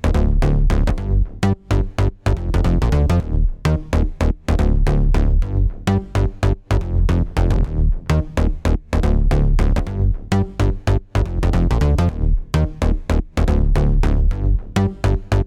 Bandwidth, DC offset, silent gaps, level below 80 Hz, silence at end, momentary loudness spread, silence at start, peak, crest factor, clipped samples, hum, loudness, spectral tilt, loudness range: 11 kHz; under 0.1%; none; -18 dBFS; 0 s; 4 LU; 0.05 s; -2 dBFS; 14 dB; under 0.1%; none; -20 LUFS; -7.5 dB/octave; 1 LU